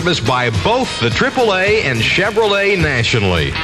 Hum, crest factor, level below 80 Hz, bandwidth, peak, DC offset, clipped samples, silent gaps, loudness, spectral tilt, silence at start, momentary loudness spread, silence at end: none; 12 dB; -34 dBFS; 13.5 kHz; -2 dBFS; under 0.1%; under 0.1%; none; -14 LUFS; -4.5 dB/octave; 0 s; 2 LU; 0 s